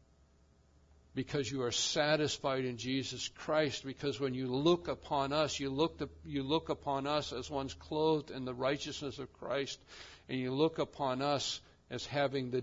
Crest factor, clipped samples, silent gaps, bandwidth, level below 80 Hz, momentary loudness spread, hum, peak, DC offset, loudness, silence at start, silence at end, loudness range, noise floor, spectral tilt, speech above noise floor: 20 dB; under 0.1%; none; 7.4 kHz; -64 dBFS; 11 LU; none; -16 dBFS; under 0.1%; -35 LUFS; 1.15 s; 0 s; 3 LU; -67 dBFS; -3.5 dB/octave; 31 dB